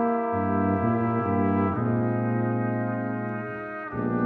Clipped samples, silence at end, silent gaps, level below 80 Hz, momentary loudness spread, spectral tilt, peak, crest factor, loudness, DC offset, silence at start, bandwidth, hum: under 0.1%; 0 s; none; -58 dBFS; 8 LU; -12 dB/octave; -12 dBFS; 14 dB; -26 LUFS; under 0.1%; 0 s; 3.9 kHz; none